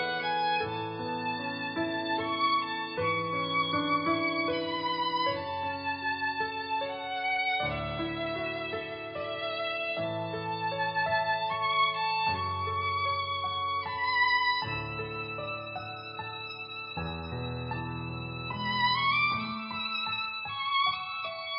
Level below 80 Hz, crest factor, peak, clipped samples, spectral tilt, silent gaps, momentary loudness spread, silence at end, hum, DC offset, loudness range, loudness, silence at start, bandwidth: -56 dBFS; 16 dB; -16 dBFS; under 0.1%; -8.5 dB/octave; none; 10 LU; 0 s; none; under 0.1%; 4 LU; -30 LUFS; 0 s; 5.4 kHz